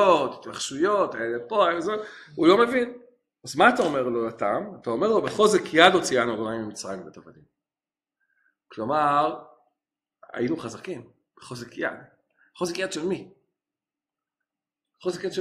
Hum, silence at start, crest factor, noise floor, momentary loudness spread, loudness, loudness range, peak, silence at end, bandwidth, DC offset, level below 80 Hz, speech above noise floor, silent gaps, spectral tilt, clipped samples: none; 0 s; 26 dB; under -90 dBFS; 19 LU; -24 LUFS; 12 LU; 0 dBFS; 0 s; 13.5 kHz; under 0.1%; -66 dBFS; over 66 dB; none; -4 dB/octave; under 0.1%